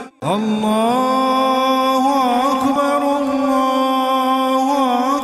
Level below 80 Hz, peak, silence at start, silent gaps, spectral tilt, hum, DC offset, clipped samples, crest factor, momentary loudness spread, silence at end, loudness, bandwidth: -58 dBFS; -6 dBFS; 0 s; none; -4.5 dB/octave; none; under 0.1%; under 0.1%; 10 dB; 2 LU; 0 s; -16 LUFS; 15 kHz